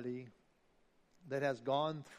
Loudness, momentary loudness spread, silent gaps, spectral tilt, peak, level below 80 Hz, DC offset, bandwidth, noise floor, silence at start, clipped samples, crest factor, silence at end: -39 LUFS; 12 LU; none; -6 dB/octave; -22 dBFS; -80 dBFS; under 0.1%; 12.5 kHz; -73 dBFS; 0 s; under 0.1%; 20 dB; 0 s